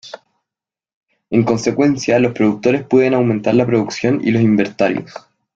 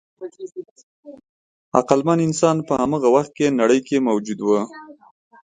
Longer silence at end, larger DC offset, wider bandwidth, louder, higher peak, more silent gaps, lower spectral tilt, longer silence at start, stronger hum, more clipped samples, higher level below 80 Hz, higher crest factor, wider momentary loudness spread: second, 0.35 s vs 0.7 s; neither; second, 7.8 kHz vs 9.4 kHz; first, -15 LUFS vs -19 LUFS; about the same, 0 dBFS vs 0 dBFS; second, 0.93-1.02 s vs 0.71-0.76 s, 0.83-1.03 s, 1.29-1.72 s; about the same, -6.5 dB/octave vs -6 dB/octave; second, 0.05 s vs 0.2 s; neither; neither; first, -54 dBFS vs -60 dBFS; about the same, 16 dB vs 20 dB; second, 4 LU vs 18 LU